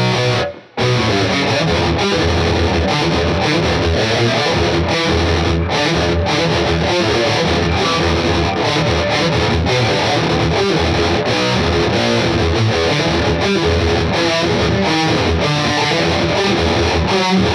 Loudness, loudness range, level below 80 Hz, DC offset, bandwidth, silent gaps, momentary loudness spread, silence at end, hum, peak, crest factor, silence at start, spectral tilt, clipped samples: -15 LUFS; 0 LU; -32 dBFS; under 0.1%; 13 kHz; none; 1 LU; 0 s; none; -2 dBFS; 12 dB; 0 s; -5 dB/octave; under 0.1%